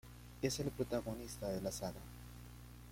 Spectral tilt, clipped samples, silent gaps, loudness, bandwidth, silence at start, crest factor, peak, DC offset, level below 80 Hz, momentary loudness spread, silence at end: -5 dB/octave; under 0.1%; none; -42 LUFS; 16.5 kHz; 0.05 s; 20 dB; -24 dBFS; under 0.1%; -58 dBFS; 16 LU; 0 s